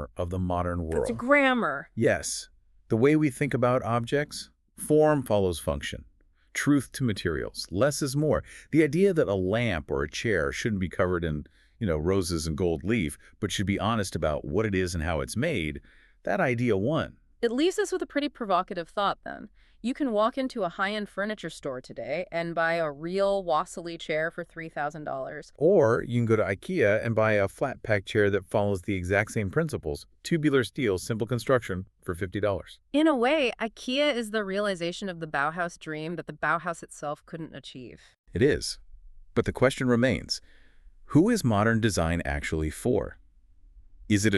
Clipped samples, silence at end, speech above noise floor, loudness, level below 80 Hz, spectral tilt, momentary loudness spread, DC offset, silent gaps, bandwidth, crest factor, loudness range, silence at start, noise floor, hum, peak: under 0.1%; 0 s; 29 dB; -27 LUFS; -50 dBFS; -5.5 dB/octave; 12 LU; under 0.1%; 38.18-38.24 s; 13.5 kHz; 18 dB; 4 LU; 0 s; -55 dBFS; none; -8 dBFS